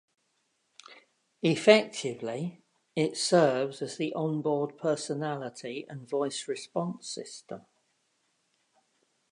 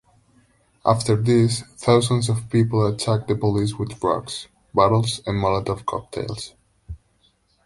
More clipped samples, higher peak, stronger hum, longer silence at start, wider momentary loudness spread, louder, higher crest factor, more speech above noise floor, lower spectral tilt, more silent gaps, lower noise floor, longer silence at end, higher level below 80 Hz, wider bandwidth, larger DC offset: neither; about the same, -4 dBFS vs -2 dBFS; neither; about the same, 0.9 s vs 0.85 s; about the same, 16 LU vs 15 LU; second, -29 LUFS vs -21 LUFS; first, 26 dB vs 20 dB; first, 46 dB vs 42 dB; second, -4.5 dB/octave vs -6 dB/octave; neither; first, -75 dBFS vs -63 dBFS; first, 1.7 s vs 0.7 s; second, -82 dBFS vs -46 dBFS; about the same, 11 kHz vs 11.5 kHz; neither